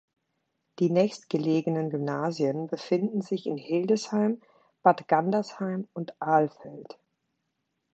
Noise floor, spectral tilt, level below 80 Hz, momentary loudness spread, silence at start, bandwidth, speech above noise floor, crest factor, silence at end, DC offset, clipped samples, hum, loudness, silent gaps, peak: -80 dBFS; -7 dB/octave; -76 dBFS; 10 LU; 0.8 s; 8.2 kHz; 53 dB; 22 dB; 1.1 s; under 0.1%; under 0.1%; none; -27 LUFS; none; -6 dBFS